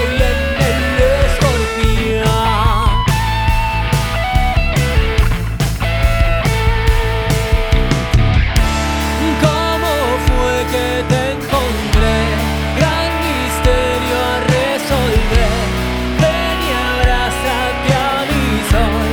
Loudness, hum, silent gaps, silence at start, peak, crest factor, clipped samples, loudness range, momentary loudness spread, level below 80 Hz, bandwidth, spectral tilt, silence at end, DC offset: -15 LUFS; none; none; 0 s; 0 dBFS; 14 dB; under 0.1%; 1 LU; 3 LU; -18 dBFS; 20 kHz; -5 dB/octave; 0 s; under 0.1%